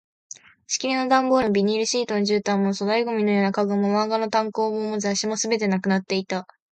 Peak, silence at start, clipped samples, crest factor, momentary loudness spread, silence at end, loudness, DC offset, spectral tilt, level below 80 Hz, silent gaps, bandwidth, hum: -6 dBFS; 0.7 s; under 0.1%; 16 dB; 7 LU; 0.3 s; -22 LUFS; under 0.1%; -4.5 dB/octave; -64 dBFS; none; 9 kHz; none